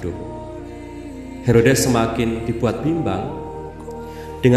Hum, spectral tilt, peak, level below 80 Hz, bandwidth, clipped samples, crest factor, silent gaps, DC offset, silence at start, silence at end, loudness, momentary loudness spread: none; -6 dB/octave; 0 dBFS; -38 dBFS; 13 kHz; under 0.1%; 20 dB; none; under 0.1%; 0 s; 0 s; -19 LUFS; 18 LU